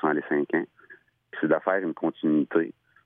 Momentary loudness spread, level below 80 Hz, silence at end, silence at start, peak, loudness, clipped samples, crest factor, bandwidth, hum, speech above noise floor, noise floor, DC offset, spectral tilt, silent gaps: 10 LU; -80 dBFS; 0.35 s; 0 s; -10 dBFS; -26 LUFS; under 0.1%; 18 dB; 3.7 kHz; none; 22 dB; -48 dBFS; under 0.1%; -10 dB/octave; none